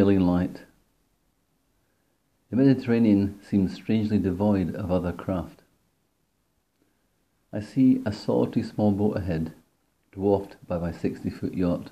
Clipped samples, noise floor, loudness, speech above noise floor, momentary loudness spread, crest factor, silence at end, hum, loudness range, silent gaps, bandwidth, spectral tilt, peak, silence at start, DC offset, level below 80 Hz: under 0.1%; -72 dBFS; -25 LUFS; 48 dB; 11 LU; 18 dB; 0.05 s; none; 5 LU; none; 12.5 kHz; -9 dB/octave; -8 dBFS; 0 s; under 0.1%; -58 dBFS